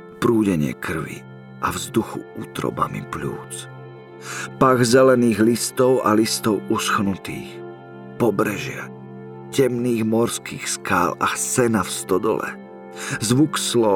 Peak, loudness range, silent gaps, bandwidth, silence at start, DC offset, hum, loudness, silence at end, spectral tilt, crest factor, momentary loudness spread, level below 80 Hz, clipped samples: -4 dBFS; 8 LU; none; 18.5 kHz; 0 s; under 0.1%; none; -20 LUFS; 0 s; -4.5 dB/octave; 18 dB; 20 LU; -54 dBFS; under 0.1%